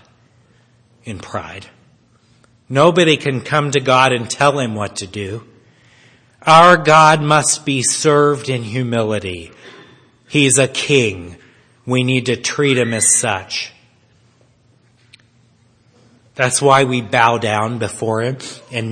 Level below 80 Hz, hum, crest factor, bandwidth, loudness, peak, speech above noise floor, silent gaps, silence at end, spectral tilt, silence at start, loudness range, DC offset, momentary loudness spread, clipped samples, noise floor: -56 dBFS; none; 16 dB; 11 kHz; -14 LUFS; 0 dBFS; 39 dB; none; 0 s; -3.5 dB/octave; 1.05 s; 7 LU; under 0.1%; 18 LU; 0.2%; -54 dBFS